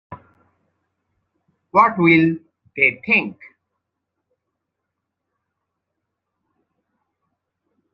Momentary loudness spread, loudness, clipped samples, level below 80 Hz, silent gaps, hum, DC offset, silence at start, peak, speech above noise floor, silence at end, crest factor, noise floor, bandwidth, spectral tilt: 18 LU; -16 LUFS; under 0.1%; -66 dBFS; none; none; under 0.1%; 0.1 s; -2 dBFS; 63 dB; 4.6 s; 22 dB; -79 dBFS; 5.6 kHz; -8.5 dB/octave